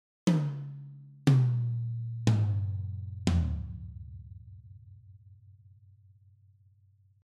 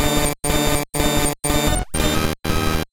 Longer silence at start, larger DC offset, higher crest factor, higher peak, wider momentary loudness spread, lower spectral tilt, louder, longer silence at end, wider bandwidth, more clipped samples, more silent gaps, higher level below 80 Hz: first, 0.25 s vs 0 s; neither; first, 22 dB vs 14 dB; second, -10 dBFS vs -6 dBFS; first, 24 LU vs 3 LU; first, -7.5 dB/octave vs -3.5 dB/octave; second, -30 LUFS vs -20 LUFS; first, 1.75 s vs 0.05 s; second, 11.5 kHz vs 17.5 kHz; neither; neither; second, -46 dBFS vs -26 dBFS